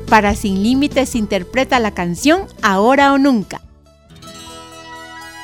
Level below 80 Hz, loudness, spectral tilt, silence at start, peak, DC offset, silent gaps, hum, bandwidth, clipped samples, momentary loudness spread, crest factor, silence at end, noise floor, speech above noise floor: -36 dBFS; -15 LUFS; -5 dB/octave; 0 s; 0 dBFS; 0.1%; none; none; 17.5 kHz; under 0.1%; 22 LU; 16 dB; 0 s; -45 dBFS; 31 dB